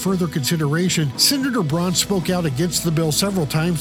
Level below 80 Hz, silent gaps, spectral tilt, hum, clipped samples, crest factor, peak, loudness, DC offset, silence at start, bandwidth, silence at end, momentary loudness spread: -46 dBFS; none; -4 dB/octave; none; under 0.1%; 16 dB; -2 dBFS; -19 LUFS; under 0.1%; 0 s; 17 kHz; 0 s; 5 LU